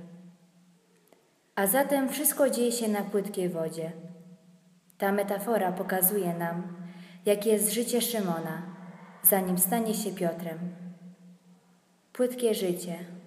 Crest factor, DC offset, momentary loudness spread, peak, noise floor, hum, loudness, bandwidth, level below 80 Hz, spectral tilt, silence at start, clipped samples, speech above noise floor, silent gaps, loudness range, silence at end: 24 dB; under 0.1%; 16 LU; -6 dBFS; -64 dBFS; none; -28 LUFS; 15.5 kHz; -82 dBFS; -4 dB/octave; 0 s; under 0.1%; 36 dB; none; 4 LU; 0 s